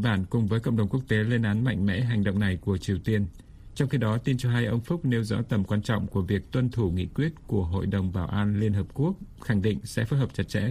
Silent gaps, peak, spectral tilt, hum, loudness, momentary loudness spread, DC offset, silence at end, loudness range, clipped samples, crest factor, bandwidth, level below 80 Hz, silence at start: none; -10 dBFS; -7.5 dB/octave; none; -27 LUFS; 4 LU; under 0.1%; 0 s; 2 LU; under 0.1%; 16 dB; 13.5 kHz; -46 dBFS; 0 s